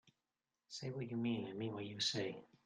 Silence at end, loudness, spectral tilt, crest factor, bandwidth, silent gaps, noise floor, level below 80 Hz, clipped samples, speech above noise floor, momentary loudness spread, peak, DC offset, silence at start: 0.2 s; -42 LUFS; -4.5 dB/octave; 20 dB; 10 kHz; none; under -90 dBFS; -80 dBFS; under 0.1%; over 47 dB; 9 LU; -24 dBFS; under 0.1%; 0.05 s